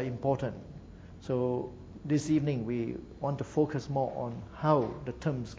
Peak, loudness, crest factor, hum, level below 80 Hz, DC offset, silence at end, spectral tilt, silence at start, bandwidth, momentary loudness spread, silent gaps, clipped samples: -12 dBFS; -32 LUFS; 20 dB; none; -54 dBFS; under 0.1%; 0 s; -7.5 dB/octave; 0 s; 8 kHz; 16 LU; none; under 0.1%